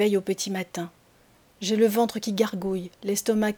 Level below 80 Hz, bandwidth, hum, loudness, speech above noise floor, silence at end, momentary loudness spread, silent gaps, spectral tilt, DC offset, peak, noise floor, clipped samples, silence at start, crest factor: -62 dBFS; over 20 kHz; none; -26 LUFS; 34 dB; 0 s; 11 LU; none; -4.5 dB/octave; under 0.1%; -8 dBFS; -59 dBFS; under 0.1%; 0 s; 16 dB